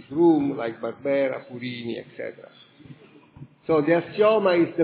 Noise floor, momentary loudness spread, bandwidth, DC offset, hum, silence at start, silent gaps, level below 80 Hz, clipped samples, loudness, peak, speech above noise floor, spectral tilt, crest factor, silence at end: -49 dBFS; 16 LU; 4 kHz; under 0.1%; none; 0.1 s; none; -66 dBFS; under 0.1%; -23 LUFS; -8 dBFS; 26 dB; -10.5 dB/octave; 16 dB; 0 s